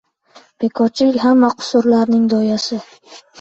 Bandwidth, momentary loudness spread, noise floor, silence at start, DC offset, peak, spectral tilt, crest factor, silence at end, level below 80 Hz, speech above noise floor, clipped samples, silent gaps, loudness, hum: 7.8 kHz; 10 LU; -48 dBFS; 0.6 s; under 0.1%; -2 dBFS; -5.5 dB/octave; 12 dB; 0.25 s; -60 dBFS; 33 dB; under 0.1%; none; -15 LUFS; none